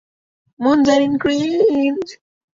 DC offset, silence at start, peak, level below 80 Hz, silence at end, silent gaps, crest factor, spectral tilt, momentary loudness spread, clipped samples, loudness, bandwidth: under 0.1%; 0.6 s; -2 dBFS; -54 dBFS; 0.4 s; none; 14 dB; -5 dB/octave; 9 LU; under 0.1%; -16 LUFS; 7.6 kHz